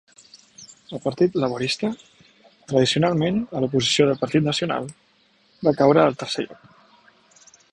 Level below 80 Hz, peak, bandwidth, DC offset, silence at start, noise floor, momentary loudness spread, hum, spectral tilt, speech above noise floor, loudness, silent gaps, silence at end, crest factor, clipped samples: -58 dBFS; -4 dBFS; 11 kHz; under 0.1%; 0.6 s; -60 dBFS; 12 LU; none; -5 dB/octave; 40 dB; -21 LUFS; none; 1.2 s; 20 dB; under 0.1%